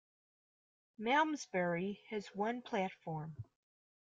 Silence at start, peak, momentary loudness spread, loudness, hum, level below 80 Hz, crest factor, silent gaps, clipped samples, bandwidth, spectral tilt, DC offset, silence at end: 1 s; -18 dBFS; 13 LU; -38 LUFS; none; -80 dBFS; 22 dB; none; under 0.1%; 9 kHz; -5.5 dB/octave; under 0.1%; 0.6 s